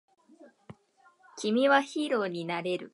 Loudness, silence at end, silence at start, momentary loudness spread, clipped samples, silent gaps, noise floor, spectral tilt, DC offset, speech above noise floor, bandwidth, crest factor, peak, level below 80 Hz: -28 LUFS; 0.05 s; 0.4 s; 11 LU; under 0.1%; none; -64 dBFS; -4.5 dB/octave; under 0.1%; 36 dB; 11.5 kHz; 22 dB; -8 dBFS; -80 dBFS